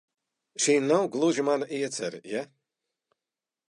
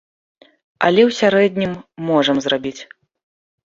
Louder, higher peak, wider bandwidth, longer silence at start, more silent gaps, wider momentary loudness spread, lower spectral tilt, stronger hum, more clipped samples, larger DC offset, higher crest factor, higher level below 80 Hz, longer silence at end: second, -27 LUFS vs -17 LUFS; second, -10 dBFS vs -2 dBFS; first, 11.5 kHz vs 7.6 kHz; second, 0.6 s vs 0.8 s; neither; about the same, 12 LU vs 13 LU; second, -3.5 dB/octave vs -5 dB/octave; neither; neither; neither; about the same, 18 dB vs 18 dB; second, -84 dBFS vs -60 dBFS; first, 1.25 s vs 0.9 s